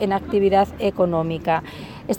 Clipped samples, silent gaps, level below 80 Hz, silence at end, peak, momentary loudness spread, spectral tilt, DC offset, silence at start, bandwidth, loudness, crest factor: under 0.1%; none; -44 dBFS; 0 s; -6 dBFS; 9 LU; -6.5 dB/octave; under 0.1%; 0 s; 18.5 kHz; -21 LUFS; 14 dB